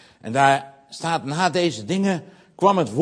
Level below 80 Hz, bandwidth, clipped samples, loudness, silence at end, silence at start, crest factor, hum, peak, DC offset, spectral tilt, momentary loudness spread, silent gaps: -64 dBFS; 10.5 kHz; under 0.1%; -21 LUFS; 0 s; 0.25 s; 20 dB; none; -2 dBFS; under 0.1%; -5 dB/octave; 10 LU; none